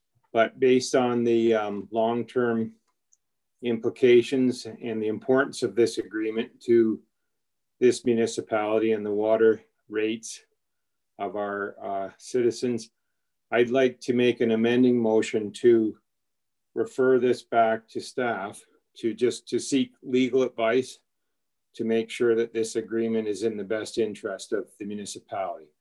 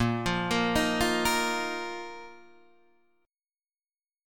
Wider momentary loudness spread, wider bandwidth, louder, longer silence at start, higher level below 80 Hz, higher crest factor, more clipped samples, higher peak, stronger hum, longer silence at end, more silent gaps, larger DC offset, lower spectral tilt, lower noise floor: second, 12 LU vs 16 LU; second, 12 kHz vs 18 kHz; about the same, -25 LUFS vs -27 LUFS; first, 0.35 s vs 0 s; second, -76 dBFS vs -50 dBFS; about the same, 18 dB vs 20 dB; neither; first, -8 dBFS vs -12 dBFS; neither; second, 0.15 s vs 1.85 s; neither; neither; about the same, -5 dB/octave vs -4 dB/octave; second, -86 dBFS vs under -90 dBFS